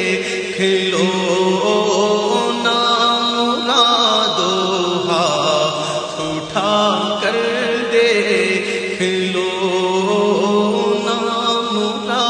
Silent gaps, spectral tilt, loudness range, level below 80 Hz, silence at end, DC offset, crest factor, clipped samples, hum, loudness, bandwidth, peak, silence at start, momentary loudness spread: none; -3.5 dB/octave; 3 LU; -60 dBFS; 0 s; under 0.1%; 16 dB; under 0.1%; none; -16 LUFS; 10 kHz; 0 dBFS; 0 s; 5 LU